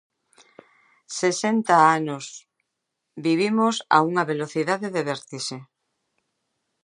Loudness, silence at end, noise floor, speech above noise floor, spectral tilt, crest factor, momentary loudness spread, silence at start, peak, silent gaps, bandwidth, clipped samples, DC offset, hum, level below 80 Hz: -22 LUFS; 1.2 s; -80 dBFS; 58 dB; -4.5 dB/octave; 22 dB; 15 LU; 1.1 s; -2 dBFS; none; 11 kHz; under 0.1%; under 0.1%; none; -78 dBFS